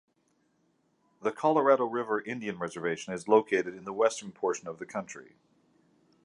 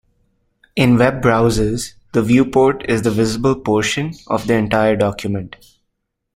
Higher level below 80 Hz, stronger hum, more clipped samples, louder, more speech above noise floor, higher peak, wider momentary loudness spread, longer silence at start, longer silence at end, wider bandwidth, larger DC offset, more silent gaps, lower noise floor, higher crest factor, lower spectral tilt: second, -76 dBFS vs -38 dBFS; neither; neither; second, -30 LUFS vs -16 LUFS; second, 43 dB vs 58 dB; second, -8 dBFS vs 0 dBFS; first, 13 LU vs 10 LU; first, 1.2 s vs 0.75 s; about the same, 1 s vs 0.9 s; second, 11 kHz vs 16 kHz; neither; neither; about the same, -72 dBFS vs -74 dBFS; first, 22 dB vs 16 dB; about the same, -5 dB/octave vs -6 dB/octave